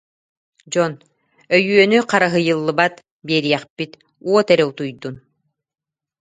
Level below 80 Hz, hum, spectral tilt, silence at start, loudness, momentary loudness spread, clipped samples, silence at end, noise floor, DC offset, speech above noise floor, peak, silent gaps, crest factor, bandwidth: -64 dBFS; none; -5 dB/octave; 0.7 s; -17 LUFS; 16 LU; under 0.1%; 1.05 s; -70 dBFS; under 0.1%; 53 dB; 0 dBFS; 3.11-3.20 s, 3.70-3.76 s; 20 dB; 9.4 kHz